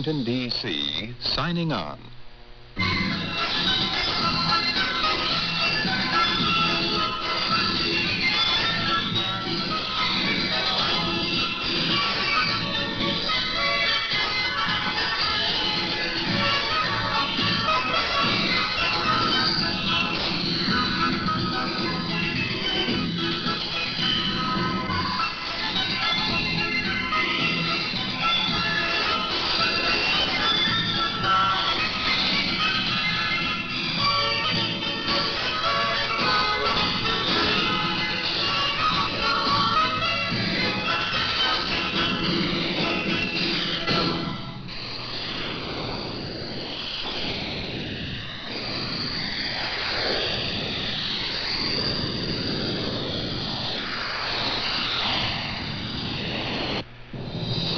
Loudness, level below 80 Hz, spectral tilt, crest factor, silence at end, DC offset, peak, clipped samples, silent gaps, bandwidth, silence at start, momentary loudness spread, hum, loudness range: -23 LUFS; -46 dBFS; -4 dB/octave; 16 dB; 0 s; under 0.1%; -10 dBFS; under 0.1%; none; 7 kHz; 0 s; 7 LU; none; 5 LU